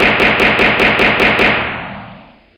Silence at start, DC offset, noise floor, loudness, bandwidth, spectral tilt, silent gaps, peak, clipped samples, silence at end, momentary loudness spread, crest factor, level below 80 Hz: 0 s; under 0.1%; -38 dBFS; -10 LUFS; 17 kHz; -5 dB/octave; none; 0 dBFS; under 0.1%; 0.4 s; 15 LU; 12 dB; -34 dBFS